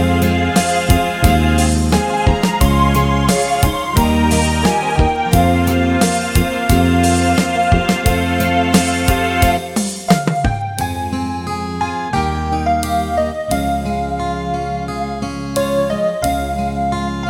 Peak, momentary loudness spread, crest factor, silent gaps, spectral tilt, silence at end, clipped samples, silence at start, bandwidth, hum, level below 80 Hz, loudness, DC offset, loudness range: 0 dBFS; 8 LU; 16 dB; none; -5 dB/octave; 0 s; under 0.1%; 0 s; 17.5 kHz; none; -24 dBFS; -16 LUFS; under 0.1%; 5 LU